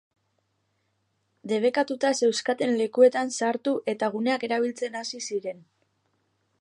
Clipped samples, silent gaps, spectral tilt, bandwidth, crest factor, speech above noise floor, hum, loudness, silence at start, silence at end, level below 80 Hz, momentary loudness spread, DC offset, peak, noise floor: under 0.1%; none; -3.5 dB/octave; 11 kHz; 20 dB; 49 dB; none; -25 LUFS; 1.45 s; 1.05 s; -82 dBFS; 11 LU; under 0.1%; -6 dBFS; -74 dBFS